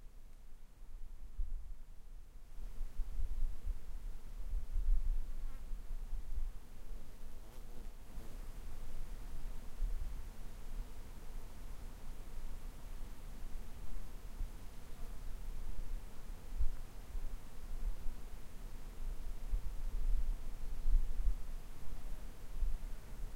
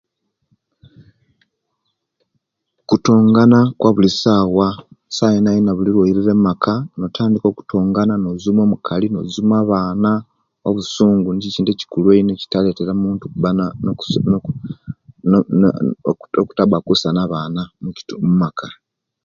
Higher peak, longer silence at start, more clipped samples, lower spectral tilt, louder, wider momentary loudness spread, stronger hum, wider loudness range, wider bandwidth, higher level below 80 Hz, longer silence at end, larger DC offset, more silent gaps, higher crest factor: second, -20 dBFS vs 0 dBFS; second, 0 s vs 2.9 s; neither; second, -5.5 dB/octave vs -7 dB/octave; second, -49 LUFS vs -16 LUFS; about the same, 12 LU vs 10 LU; neither; first, 8 LU vs 4 LU; first, 13.5 kHz vs 7.4 kHz; first, -40 dBFS vs -48 dBFS; second, 0 s vs 0.5 s; neither; neither; about the same, 18 dB vs 16 dB